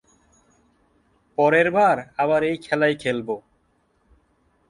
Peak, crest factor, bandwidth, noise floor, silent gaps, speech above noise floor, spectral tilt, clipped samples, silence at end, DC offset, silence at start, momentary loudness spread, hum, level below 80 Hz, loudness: -4 dBFS; 20 dB; 11 kHz; -65 dBFS; none; 45 dB; -6 dB/octave; under 0.1%; 1.3 s; under 0.1%; 1.4 s; 13 LU; none; -60 dBFS; -21 LUFS